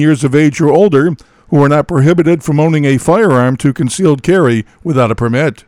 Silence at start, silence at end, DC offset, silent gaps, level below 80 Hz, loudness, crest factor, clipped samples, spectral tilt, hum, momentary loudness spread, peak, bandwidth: 0 s; 0.15 s; under 0.1%; none; -42 dBFS; -11 LUFS; 10 dB; under 0.1%; -7 dB/octave; none; 5 LU; 0 dBFS; 13 kHz